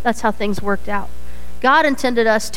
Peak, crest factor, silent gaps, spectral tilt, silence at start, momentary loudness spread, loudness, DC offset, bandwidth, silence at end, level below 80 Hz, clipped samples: -2 dBFS; 18 dB; none; -4 dB/octave; 0 s; 12 LU; -18 LUFS; 9%; 17 kHz; 0 s; -38 dBFS; under 0.1%